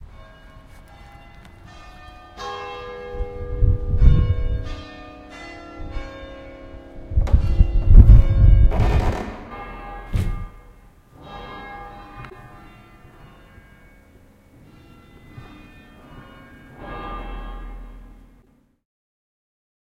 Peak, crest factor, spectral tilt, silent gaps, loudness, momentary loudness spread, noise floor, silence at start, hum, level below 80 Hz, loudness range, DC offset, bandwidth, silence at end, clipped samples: 0 dBFS; 20 dB; -8.5 dB/octave; none; -20 LUFS; 27 LU; -57 dBFS; 2.4 s; none; -22 dBFS; 23 LU; under 0.1%; 6.4 kHz; 1.95 s; under 0.1%